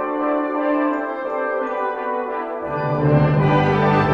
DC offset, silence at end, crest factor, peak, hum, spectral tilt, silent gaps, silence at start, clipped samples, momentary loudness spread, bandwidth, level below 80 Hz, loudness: under 0.1%; 0 s; 14 dB; -4 dBFS; none; -9 dB/octave; none; 0 s; under 0.1%; 8 LU; 6 kHz; -44 dBFS; -20 LUFS